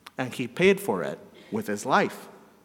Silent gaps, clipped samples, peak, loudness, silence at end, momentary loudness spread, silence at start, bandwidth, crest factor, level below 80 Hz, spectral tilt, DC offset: none; under 0.1%; -6 dBFS; -26 LUFS; 0.25 s; 13 LU; 0.05 s; 17 kHz; 20 dB; -66 dBFS; -5 dB/octave; under 0.1%